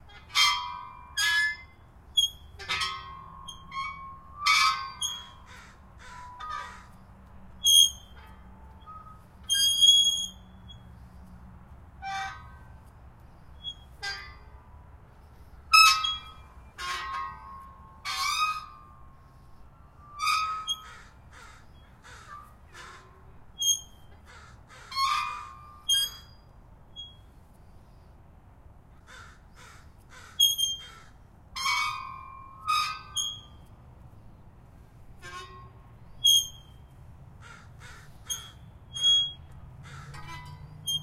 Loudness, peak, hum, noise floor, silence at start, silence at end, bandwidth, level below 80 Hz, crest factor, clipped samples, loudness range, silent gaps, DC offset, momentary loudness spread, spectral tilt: -25 LUFS; -4 dBFS; none; -53 dBFS; 0.1 s; 0 s; 16 kHz; -54 dBFS; 28 dB; under 0.1%; 11 LU; none; under 0.1%; 27 LU; 1.5 dB/octave